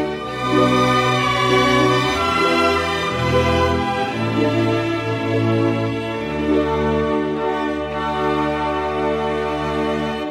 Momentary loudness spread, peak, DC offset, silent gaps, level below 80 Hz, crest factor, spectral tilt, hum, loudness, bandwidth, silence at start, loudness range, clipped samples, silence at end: 7 LU; -4 dBFS; under 0.1%; none; -38 dBFS; 14 dB; -5.5 dB/octave; none; -19 LUFS; 15.5 kHz; 0 s; 4 LU; under 0.1%; 0 s